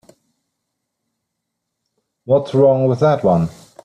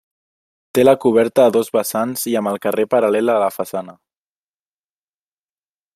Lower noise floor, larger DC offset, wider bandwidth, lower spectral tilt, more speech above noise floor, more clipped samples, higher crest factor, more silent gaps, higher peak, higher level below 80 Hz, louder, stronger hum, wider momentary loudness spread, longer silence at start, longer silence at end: second, -77 dBFS vs under -90 dBFS; neither; second, 10 kHz vs 16 kHz; first, -9 dB/octave vs -5 dB/octave; second, 63 dB vs over 74 dB; neither; about the same, 16 dB vs 18 dB; neither; about the same, -2 dBFS vs -2 dBFS; first, -54 dBFS vs -62 dBFS; about the same, -15 LUFS vs -17 LUFS; second, none vs 50 Hz at -55 dBFS; second, 5 LU vs 9 LU; first, 2.25 s vs 0.75 s; second, 0.35 s vs 2.05 s